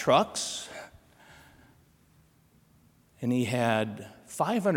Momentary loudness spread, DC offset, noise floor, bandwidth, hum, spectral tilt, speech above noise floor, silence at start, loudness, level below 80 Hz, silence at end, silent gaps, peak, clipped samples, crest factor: 19 LU; under 0.1%; -63 dBFS; 17.5 kHz; none; -4.5 dB/octave; 36 dB; 0 s; -29 LUFS; -68 dBFS; 0 s; none; -10 dBFS; under 0.1%; 22 dB